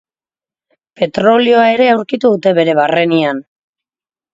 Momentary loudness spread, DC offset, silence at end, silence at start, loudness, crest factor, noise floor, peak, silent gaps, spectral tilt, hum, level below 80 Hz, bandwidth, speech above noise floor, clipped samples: 9 LU; under 0.1%; 0.9 s; 1 s; -12 LUFS; 14 dB; under -90 dBFS; 0 dBFS; none; -6.5 dB/octave; none; -58 dBFS; 7.8 kHz; over 79 dB; under 0.1%